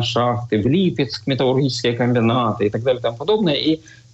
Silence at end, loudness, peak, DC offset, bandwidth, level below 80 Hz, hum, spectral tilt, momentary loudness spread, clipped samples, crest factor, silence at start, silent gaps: 0.35 s; -19 LUFS; -8 dBFS; under 0.1%; 8.2 kHz; -50 dBFS; none; -6.5 dB/octave; 4 LU; under 0.1%; 10 dB; 0 s; none